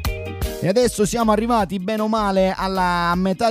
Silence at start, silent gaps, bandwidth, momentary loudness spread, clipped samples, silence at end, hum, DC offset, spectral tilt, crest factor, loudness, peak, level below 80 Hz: 0 s; none; 16 kHz; 6 LU; under 0.1%; 0 s; none; under 0.1%; -5.5 dB/octave; 16 dB; -20 LUFS; -4 dBFS; -34 dBFS